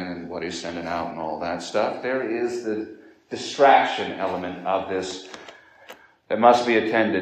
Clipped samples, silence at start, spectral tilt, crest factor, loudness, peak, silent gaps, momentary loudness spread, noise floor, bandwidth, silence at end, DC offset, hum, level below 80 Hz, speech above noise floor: under 0.1%; 0 s; -4.5 dB/octave; 22 dB; -23 LUFS; -2 dBFS; none; 16 LU; -48 dBFS; 9.8 kHz; 0 s; under 0.1%; none; -68 dBFS; 25 dB